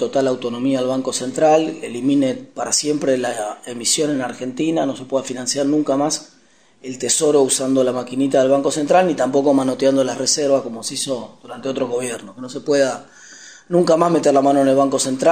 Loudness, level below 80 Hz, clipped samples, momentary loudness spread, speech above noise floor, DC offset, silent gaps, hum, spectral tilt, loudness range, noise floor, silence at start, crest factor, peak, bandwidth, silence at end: -18 LUFS; -66 dBFS; under 0.1%; 12 LU; 36 dB; 0.2%; none; none; -4 dB/octave; 4 LU; -53 dBFS; 0 s; 16 dB; -2 dBFS; 15.5 kHz; 0 s